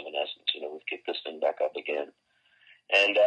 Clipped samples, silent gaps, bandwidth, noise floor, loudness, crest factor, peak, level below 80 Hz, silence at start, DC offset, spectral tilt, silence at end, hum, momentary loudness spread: under 0.1%; none; 9.2 kHz; -68 dBFS; -29 LUFS; 20 dB; -10 dBFS; -86 dBFS; 0 s; under 0.1%; -1 dB/octave; 0 s; none; 12 LU